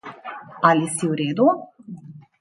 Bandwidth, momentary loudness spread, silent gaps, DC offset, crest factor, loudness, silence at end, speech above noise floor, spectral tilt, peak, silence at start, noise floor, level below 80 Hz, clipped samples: 11.5 kHz; 21 LU; none; under 0.1%; 20 dB; -20 LUFS; 0.2 s; 21 dB; -5 dB/octave; -2 dBFS; 0.05 s; -40 dBFS; -70 dBFS; under 0.1%